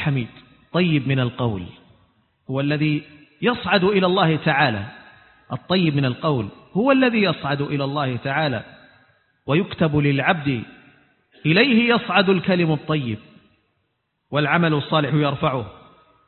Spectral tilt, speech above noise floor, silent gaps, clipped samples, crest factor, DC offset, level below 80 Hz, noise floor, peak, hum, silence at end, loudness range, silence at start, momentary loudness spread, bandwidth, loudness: -11.5 dB/octave; 52 dB; none; under 0.1%; 20 dB; under 0.1%; -52 dBFS; -72 dBFS; -2 dBFS; none; 0.55 s; 4 LU; 0 s; 12 LU; 4.4 kHz; -20 LUFS